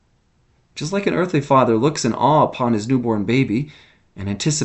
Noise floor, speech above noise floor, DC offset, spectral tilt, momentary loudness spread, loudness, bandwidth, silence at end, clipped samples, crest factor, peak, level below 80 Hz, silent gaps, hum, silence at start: -60 dBFS; 42 dB; under 0.1%; -5.5 dB/octave; 13 LU; -18 LUFS; 8.4 kHz; 0 s; under 0.1%; 18 dB; -2 dBFS; -52 dBFS; none; none; 0.75 s